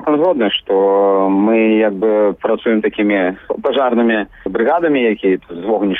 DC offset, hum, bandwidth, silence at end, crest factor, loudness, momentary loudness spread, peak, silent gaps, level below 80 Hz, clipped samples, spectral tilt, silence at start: under 0.1%; none; 4 kHz; 0 s; 8 dB; -15 LUFS; 6 LU; -6 dBFS; none; -52 dBFS; under 0.1%; -8.5 dB/octave; 0 s